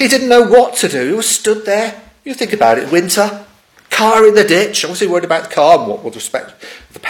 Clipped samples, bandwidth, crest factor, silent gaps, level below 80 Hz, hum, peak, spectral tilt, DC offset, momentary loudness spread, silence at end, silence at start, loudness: 0.9%; 17.5 kHz; 12 dB; none; -54 dBFS; none; 0 dBFS; -3 dB/octave; under 0.1%; 14 LU; 0 s; 0 s; -12 LUFS